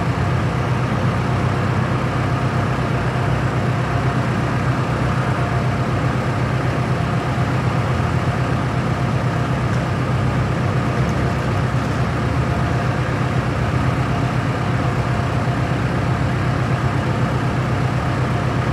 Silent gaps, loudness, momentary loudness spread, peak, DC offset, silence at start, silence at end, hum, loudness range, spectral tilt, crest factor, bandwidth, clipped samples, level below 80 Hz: none; -20 LUFS; 1 LU; -6 dBFS; under 0.1%; 0 s; 0 s; none; 0 LU; -7 dB/octave; 12 dB; 11.5 kHz; under 0.1%; -32 dBFS